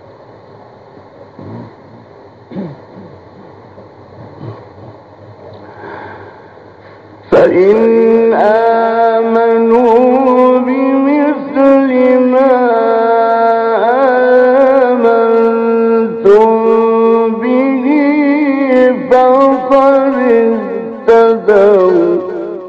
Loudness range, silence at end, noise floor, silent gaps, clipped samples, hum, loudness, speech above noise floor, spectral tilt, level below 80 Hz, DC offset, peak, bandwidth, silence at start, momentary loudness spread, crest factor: 2 LU; 0 s; -37 dBFS; none; under 0.1%; none; -9 LUFS; 29 dB; -8 dB/octave; -52 dBFS; under 0.1%; 0 dBFS; 6.4 kHz; 1.4 s; 18 LU; 10 dB